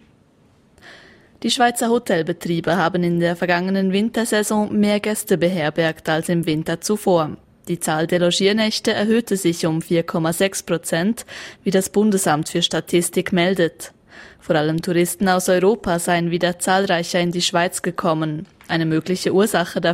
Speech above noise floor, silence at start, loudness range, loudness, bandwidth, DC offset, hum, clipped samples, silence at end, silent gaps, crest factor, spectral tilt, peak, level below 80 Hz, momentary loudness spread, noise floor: 36 dB; 0.85 s; 2 LU; -19 LUFS; 16 kHz; under 0.1%; none; under 0.1%; 0 s; none; 16 dB; -4.5 dB/octave; -4 dBFS; -54 dBFS; 6 LU; -55 dBFS